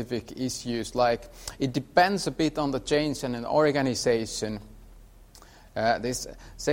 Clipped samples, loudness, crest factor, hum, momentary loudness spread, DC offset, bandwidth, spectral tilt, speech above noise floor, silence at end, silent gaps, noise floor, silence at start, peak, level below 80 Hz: under 0.1%; -27 LUFS; 20 dB; none; 11 LU; under 0.1%; 16.5 kHz; -4.5 dB/octave; 25 dB; 0 s; none; -51 dBFS; 0 s; -8 dBFS; -50 dBFS